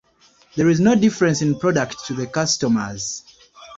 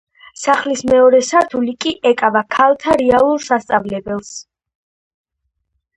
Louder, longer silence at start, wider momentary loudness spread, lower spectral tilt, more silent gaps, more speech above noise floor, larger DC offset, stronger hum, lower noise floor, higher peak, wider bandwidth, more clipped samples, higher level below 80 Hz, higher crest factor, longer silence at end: second, -19 LUFS vs -14 LUFS; first, 0.55 s vs 0.4 s; about the same, 12 LU vs 13 LU; first, -5 dB/octave vs -3.5 dB/octave; neither; second, 37 dB vs 58 dB; neither; neither; second, -55 dBFS vs -72 dBFS; second, -4 dBFS vs 0 dBFS; second, 7.8 kHz vs 10.5 kHz; neither; about the same, -54 dBFS vs -50 dBFS; about the same, 16 dB vs 16 dB; second, 0 s vs 1.55 s